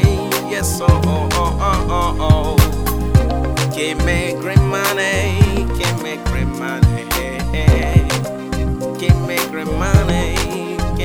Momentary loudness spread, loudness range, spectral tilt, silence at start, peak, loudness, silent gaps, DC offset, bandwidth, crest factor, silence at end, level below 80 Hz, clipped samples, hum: 7 LU; 2 LU; -5.5 dB/octave; 0 s; 0 dBFS; -17 LUFS; none; 1%; 17.5 kHz; 16 dB; 0 s; -22 dBFS; under 0.1%; none